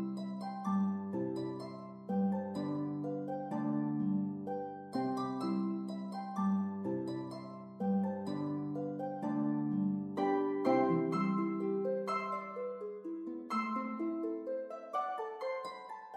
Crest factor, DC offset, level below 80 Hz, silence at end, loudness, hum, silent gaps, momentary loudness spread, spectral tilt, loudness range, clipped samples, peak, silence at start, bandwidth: 18 dB; under 0.1%; -86 dBFS; 0 s; -37 LUFS; none; none; 9 LU; -8.5 dB/octave; 4 LU; under 0.1%; -18 dBFS; 0 s; 9 kHz